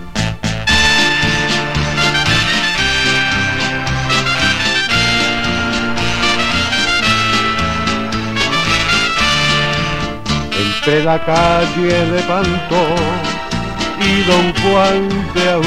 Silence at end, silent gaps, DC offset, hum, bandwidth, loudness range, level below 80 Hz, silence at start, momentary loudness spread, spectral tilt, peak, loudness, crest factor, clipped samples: 0 s; none; 2%; none; 16 kHz; 2 LU; -30 dBFS; 0 s; 6 LU; -4 dB/octave; 0 dBFS; -13 LUFS; 14 dB; under 0.1%